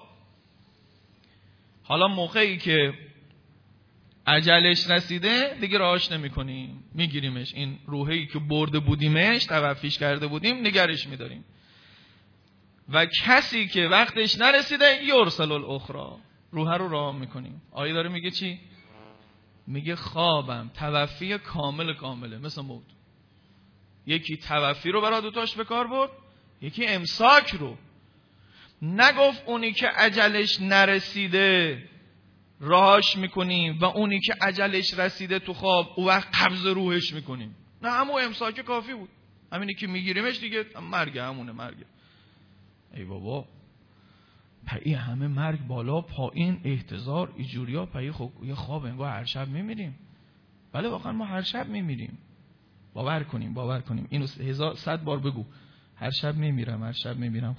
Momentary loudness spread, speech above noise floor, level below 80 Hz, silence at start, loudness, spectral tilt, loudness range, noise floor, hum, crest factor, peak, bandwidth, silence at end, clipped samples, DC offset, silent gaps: 18 LU; 34 dB; -56 dBFS; 0 s; -24 LUFS; -5.5 dB/octave; 12 LU; -59 dBFS; none; 24 dB; -2 dBFS; 5.4 kHz; 0 s; under 0.1%; under 0.1%; none